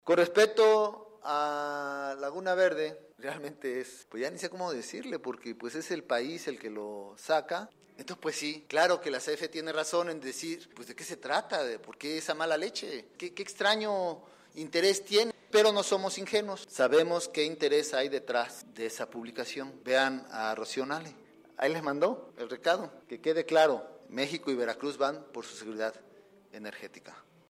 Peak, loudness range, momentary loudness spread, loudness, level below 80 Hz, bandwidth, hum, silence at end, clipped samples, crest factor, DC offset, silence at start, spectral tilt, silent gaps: -10 dBFS; 7 LU; 16 LU; -31 LUFS; -84 dBFS; 15.5 kHz; none; 0.3 s; under 0.1%; 22 dB; under 0.1%; 0.05 s; -3 dB/octave; none